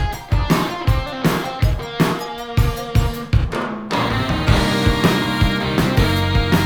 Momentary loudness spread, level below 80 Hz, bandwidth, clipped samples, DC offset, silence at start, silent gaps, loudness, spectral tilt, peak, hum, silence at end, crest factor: 5 LU; -24 dBFS; over 20 kHz; under 0.1%; under 0.1%; 0 s; none; -19 LUFS; -6 dB/octave; 0 dBFS; none; 0 s; 16 dB